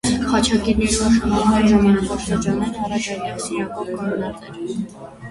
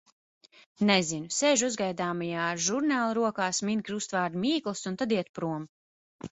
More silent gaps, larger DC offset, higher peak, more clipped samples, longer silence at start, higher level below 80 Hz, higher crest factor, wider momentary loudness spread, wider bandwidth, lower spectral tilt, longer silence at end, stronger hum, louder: second, none vs 5.29-5.34 s, 5.69-6.19 s; neither; first, -2 dBFS vs -8 dBFS; neither; second, 0.05 s vs 0.8 s; first, -36 dBFS vs -70 dBFS; about the same, 16 dB vs 20 dB; first, 13 LU vs 10 LU; first, 11.5 kHz vs 8.4 kHz; first, -5 dB/octave vs -3.5 dB/octave; about the same, 0 s vs 0.05 s; neither; first, -19 LUFS vs -28 LUFS